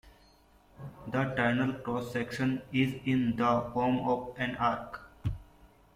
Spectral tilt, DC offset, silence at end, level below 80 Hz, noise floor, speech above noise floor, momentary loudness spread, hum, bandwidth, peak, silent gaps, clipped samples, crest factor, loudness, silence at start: -7 dB/octave; under 0.1%; 0.3 s; -54 dBFS; -61 dBFS; 31 dB; 12 LU; none; 14.5 kHz; -14 dBFS; none; under 0.1%; 18 dB; -31 LUFS; 0.05 s